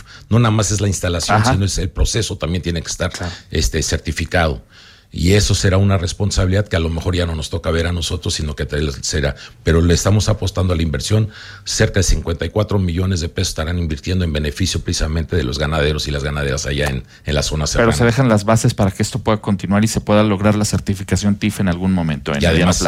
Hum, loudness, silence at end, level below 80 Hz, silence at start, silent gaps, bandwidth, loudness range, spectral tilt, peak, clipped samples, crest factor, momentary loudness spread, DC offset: none; -17 LUFS; 0 s; -28 dBFS; 0 s; none; 15.5 kHz; 3 LU; -5 dB/octave; -2 dBFS; under 0.1%; 14 dB; 7 LU; under 0.1%